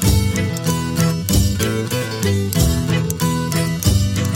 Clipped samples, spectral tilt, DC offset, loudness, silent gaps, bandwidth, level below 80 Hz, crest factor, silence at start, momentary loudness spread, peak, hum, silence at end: under 0.1%; -5 dB/octave; under 0.1%; -18 LUFS; none; 17 kHz; -28 dBFS; 16 dB; 0 s; 3 LU; -2 dBFS; none; 0 s